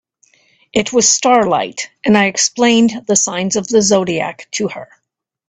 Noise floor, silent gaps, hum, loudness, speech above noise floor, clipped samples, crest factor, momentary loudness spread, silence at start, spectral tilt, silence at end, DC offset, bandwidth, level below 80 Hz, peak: -73 dBFS; none; none; -14 LUFS; 59 dB; under 0.1%; 16 dB; 10 LU; 0.75 s; -3 dB/octave; 0.65 s; under 0.1%; 9.4 kHz; -54 dBFS; 0 dBFS